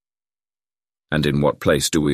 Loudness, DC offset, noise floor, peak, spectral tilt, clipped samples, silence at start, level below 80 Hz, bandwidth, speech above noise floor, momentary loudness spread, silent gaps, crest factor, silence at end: -19 LUFS; under 0.1%; under -90 dBFS; -4 dBFS; -5 dB/octave; under 0.1%; 1.1 s; -42 dBFS; 15 kHz; over 72 dB; 4 LU; none; 18 dB; 0 s